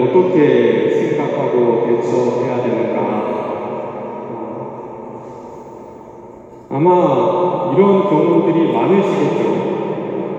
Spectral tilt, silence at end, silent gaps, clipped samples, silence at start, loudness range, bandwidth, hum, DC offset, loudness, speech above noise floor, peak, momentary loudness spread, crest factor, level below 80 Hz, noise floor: -8 dB/octave; 0 s; none; under 0.1%; 0 s; 11 LU; 7.8 kHz; none; under 0.1%; -15 LUFS; 24 dB; 0 dBFS; 19 LU; 16 dB; -60 dBFS; -37 dBFS